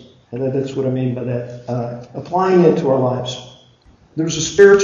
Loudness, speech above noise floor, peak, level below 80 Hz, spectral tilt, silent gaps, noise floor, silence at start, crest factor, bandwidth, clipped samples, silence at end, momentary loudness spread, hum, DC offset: -18 LUFS; 34 dB; 0 dBFS; -52 dBFS; -5.5 dB/octave; none; -50 dBFS; 0.3 s; 16 dB; 7.6 kHz; under 0.1%; 0 s; 15 LU; none; under 0.1%